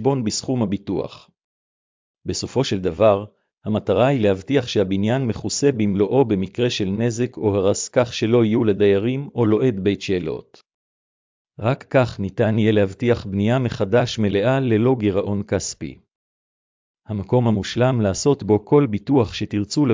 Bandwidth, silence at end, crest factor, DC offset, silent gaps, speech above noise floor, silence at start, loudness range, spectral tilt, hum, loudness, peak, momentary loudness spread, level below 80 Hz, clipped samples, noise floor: 7.6 kHz; 0 s; 16 dB; under 0.1%; 1.44-2.14 s, 10.74-11.45 s, 16.15-16.94 s; over 71 dB; 0 s; 4 LU; -6 dB/octave; none; -20 LUFS; -4 dBFS; 8 LU; -46 dBFS; under 0.1%; under -90 dBFS